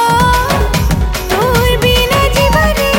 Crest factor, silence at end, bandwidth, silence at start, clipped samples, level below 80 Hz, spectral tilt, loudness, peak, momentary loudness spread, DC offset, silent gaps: 10 dB; 0 s; 17 kHz; 0 s; under 0.1%; -18 dBFS; -4.5 dB/octave; -11 LUFS; 0 dBFS; 4 LU; under 0.1%; none